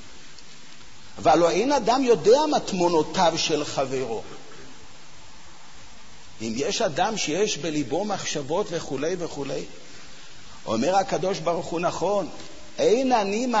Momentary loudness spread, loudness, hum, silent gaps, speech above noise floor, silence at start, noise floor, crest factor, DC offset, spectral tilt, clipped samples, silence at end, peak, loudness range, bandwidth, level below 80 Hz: 24 LU; -24 LUFS; none; none; 25 dB; 0 s; -48 dBFS; 18 dB; 1%; -4 dB/octave; under 0.1%; 0 s; -8 dBFS; 8 LU; 8 kHz; -54 dBFS